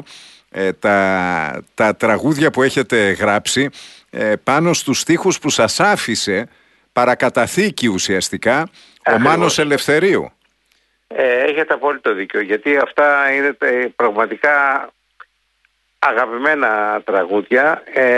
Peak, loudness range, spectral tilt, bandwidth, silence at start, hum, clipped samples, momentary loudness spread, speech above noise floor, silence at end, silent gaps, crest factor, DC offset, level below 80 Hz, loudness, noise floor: -2 dBFS; 2 LU; -4 dB/octave; 12.5 kHz; 0.1 s; none; under 0.1%; 7 LU; 47 dB; 0 s; none; 16 dB; under 0.1%; -56 dBFS; -16 LUFS; -63 dBFS